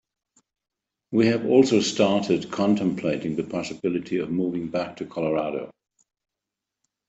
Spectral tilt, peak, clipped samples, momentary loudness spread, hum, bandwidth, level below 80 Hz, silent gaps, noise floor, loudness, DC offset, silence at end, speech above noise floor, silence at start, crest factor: -5.5 dB/octave; -4 dBFS; under 0.1%; 11 LU; none; 8.2 kHz; -64 dBFS; none; -86 dBFS; -24 LUFS; under 0.1%; 1.4 s; 63 dB; 1.1 s; 20 dB